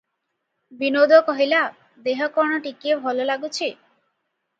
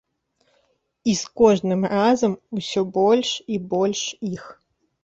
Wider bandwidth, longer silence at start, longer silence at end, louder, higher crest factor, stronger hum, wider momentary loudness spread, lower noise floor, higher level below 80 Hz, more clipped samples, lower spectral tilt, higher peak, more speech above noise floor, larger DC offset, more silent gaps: about the same, 8 kHz vs 8 kHz; second, 0.7 s vs 1.05 s; first, 0.85 s vs 0.5 s; about the same, -21 LUFS vs -21 LUFS; about the same, 22 dB vs 18 dB; neither; about the same, 12 LU vs 11 LU; first, -77 dBFS vs -68 dBFS; second, -78 dBFS vs -60 dBFS; neither; second, -2.5 dB/octave vs -5 dB/octave; first, 0 dBFS vs -4 dBFS; first, 57 dB vs 47 dB; neither; neither